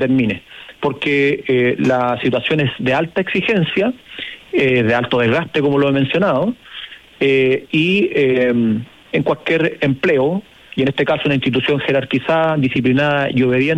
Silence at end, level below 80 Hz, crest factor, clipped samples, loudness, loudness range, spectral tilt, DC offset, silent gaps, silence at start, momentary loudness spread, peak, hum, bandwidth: 0 s; -52 dBFS; 12 dB; under 0.1%; -16 LUFS; 1 LU; -7.5 dB/octave; under 0.1%; none; 0 s; 8 LU; -4 dBFS; none; 10.5 kHz